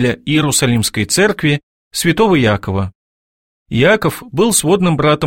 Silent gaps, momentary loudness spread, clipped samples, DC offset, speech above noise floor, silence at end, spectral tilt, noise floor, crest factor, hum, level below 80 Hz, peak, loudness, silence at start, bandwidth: 1.63-1.91 s, 2.95-3.66 s; 9 LU; under 0.1%; 0.4%; over 77 dB; 0 s; -4.5 dB/octave; under -90 dBFS; 14 dB; none; -42 dBFS; 0 dBFS; -14 LUFS; 0 s; 16.5 kHz